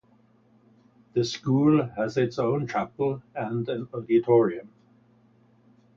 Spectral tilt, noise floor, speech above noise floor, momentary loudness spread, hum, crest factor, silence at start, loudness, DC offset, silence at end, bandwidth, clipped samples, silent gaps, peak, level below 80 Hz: -7 dB/octave; -61 dBFS; 36 dB; 10 LU; none; 18 dB; 1.15 s; -25 LUFS; under 0.1%; 1.35 s; 7.4 kHz; under 0.1%; none; -8 dBFS; -64 dBFS